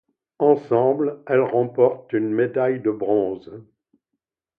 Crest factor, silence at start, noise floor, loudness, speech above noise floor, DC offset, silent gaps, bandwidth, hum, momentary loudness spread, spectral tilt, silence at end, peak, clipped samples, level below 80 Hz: 18 dB; 0.4 s; -81 dBFS; -21 LUFS; 61 dB; under 0.1%; none; 4.7 kHz; none; 6 LU; -10.5 dB/octave; 0.95 s; -4 dBFS; under 0.1%; -68 dBFS